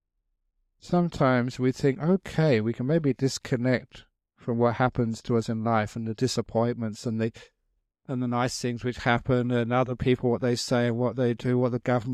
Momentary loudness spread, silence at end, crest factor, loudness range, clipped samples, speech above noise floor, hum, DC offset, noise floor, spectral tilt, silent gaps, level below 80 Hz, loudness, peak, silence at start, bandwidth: 6 LU; 0 s; 18 dB; 4 LU; under 0.1%; 52 dB; none; under 0.1%; -77 dBFS; -6.5 dB/octave; none; -54 dBFS; -26 LUFS; -8 dBFS; 0.85 s; 13 kHz